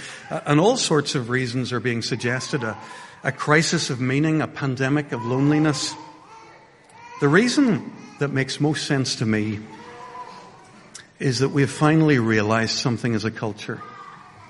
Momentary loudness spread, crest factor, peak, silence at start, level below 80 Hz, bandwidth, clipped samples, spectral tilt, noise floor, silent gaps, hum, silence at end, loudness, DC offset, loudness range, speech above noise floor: 21 LU; 22 dB; -2 dBFS; 0 s; -60 dBFS; 11.5 kHz; under 0.1%; -5 dB/octave; -49 dBFS; none; none; 0 s; -22 LUFS; under 0.1%; 3 LU; 28 dB